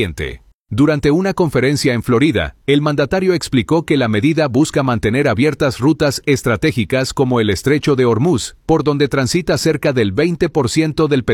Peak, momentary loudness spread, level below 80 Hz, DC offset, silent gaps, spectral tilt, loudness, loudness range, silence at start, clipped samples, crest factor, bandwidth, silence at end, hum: -2 dBFS; 3 LU; -40 dBFS; under 0.1%; 0.54-0.66 s; -6 dB/octave; -15 LUFS; 1 LU; 0 s; under 0.1%; 14 dB; 17 kHz; 0 s; none